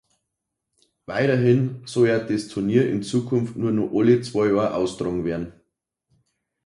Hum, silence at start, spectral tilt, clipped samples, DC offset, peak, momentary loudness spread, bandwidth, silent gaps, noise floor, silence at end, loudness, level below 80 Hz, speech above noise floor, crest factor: none; 1.1 s; -7 dB/octave; under 0.1%; under 0.1%; -6 dBFS; 8 LU; 11.5 kHz; none; -81 dBFS; 1.15 s; -22 LUFS; -54 dBFS; 60 dB; 18 dB